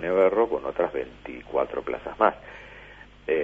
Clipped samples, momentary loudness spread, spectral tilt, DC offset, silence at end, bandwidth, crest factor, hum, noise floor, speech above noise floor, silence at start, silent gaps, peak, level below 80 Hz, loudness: under 0.1%; 22 LU; -7 dB/octave; under 0.1%; 0 s; 6.2 kHz; 22 dB; 50 Hz at -50 dBFS; -47 dBFS; 22 dB; 0 s; none; -4 dBFS; -54 dBFS; -26 LUFS